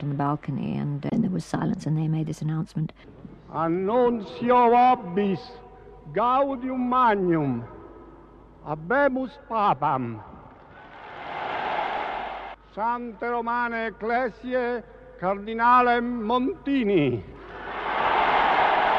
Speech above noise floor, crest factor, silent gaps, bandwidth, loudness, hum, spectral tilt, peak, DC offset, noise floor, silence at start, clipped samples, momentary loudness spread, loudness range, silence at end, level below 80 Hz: 25 dB; 16 dB; none; 10 kHz; -25 LUFS; none; -7.5 dB/octave; -8 dBFS; under 0.1%; -49 dBFS; 0 s; under 0.1%; 15 LU; 6 LU; 0 s; -54 dBFS